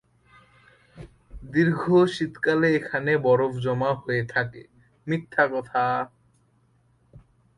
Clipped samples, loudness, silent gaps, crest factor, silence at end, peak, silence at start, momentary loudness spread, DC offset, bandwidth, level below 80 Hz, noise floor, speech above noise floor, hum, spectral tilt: under 0.1%; -24 LUFS; none; 18 dB; 0.4 s; -8 dBFS; 0.95 s; 9 LU; under 0.1%; 11.5 kHz; -56 dBFS; -63 dBFS; 40 dB; none; -7.5 dB/octave